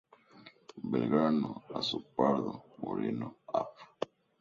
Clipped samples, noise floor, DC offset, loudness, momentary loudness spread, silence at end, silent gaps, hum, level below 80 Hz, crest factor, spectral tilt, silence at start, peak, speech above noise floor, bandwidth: under 0.1%; -58 dBFS; under 0.1%; -34 LUFS; 15 LU; 0.35 s; none; none; -72 dBFS; 22 dB; -7 dB/octave; 0.35 s; -14 dBFS; 25 dB; 7.4 kHz